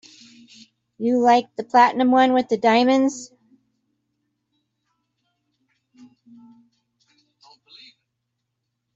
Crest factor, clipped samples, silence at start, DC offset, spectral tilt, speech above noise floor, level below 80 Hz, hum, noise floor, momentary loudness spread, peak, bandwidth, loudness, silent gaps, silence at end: 20 dB; under 0.1%; 1 s; under 0.1%; -4 dB/octave; 60 dB; -72 dBFS; none; -78 dBFS; 8 LU; -2 dBFS; 7.8 kHz; -18 LUFS; none; 5.7 s